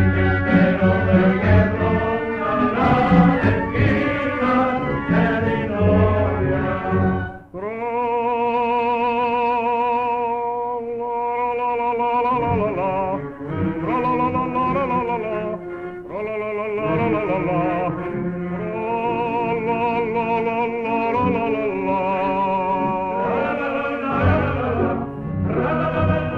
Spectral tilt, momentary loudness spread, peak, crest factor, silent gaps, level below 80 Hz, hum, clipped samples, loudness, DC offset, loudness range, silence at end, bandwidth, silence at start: -9.5 dB/octave; 9 LU; -2 dBFS; 18 dB; none; -40 dBFS; none; under 0.1%; -20 LUFS; under 0.1%; 5 LU; 0 s; 5.8 kHz; 0 s